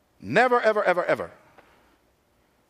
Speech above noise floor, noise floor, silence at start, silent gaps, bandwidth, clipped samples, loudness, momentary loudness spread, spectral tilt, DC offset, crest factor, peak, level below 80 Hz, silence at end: 43 dB; -65 dBFS; 0.2 s; none; 14 kHz; under 0.1%; -22 LUFS; 8 LU; -5.5 dB/octave; under 0.1%; 20 dB; -6 dBFS; -70 dBFS; 1.4 s